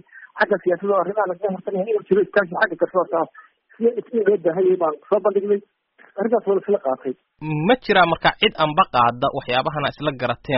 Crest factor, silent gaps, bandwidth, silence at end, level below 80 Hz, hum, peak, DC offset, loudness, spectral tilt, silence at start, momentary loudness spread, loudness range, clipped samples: 18 dB; none; 5.8 kHz; 0 s; -54 dBFS; none; -2 dBFS; under 0.1%; -20 LUFS; -3 dB/octave; 0.15 s; 8 LU; 3 LU; under 0.1%